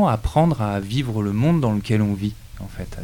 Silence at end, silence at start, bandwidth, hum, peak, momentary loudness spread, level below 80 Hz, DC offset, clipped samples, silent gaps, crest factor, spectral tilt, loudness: 0 s; 0 s; 18 kHz; none; -6 dBFS; 15 LU; -36 dBFS; under 0.1%; under 0.1%; none; 14 dB; -7.5 dB/octave; -21 LUFS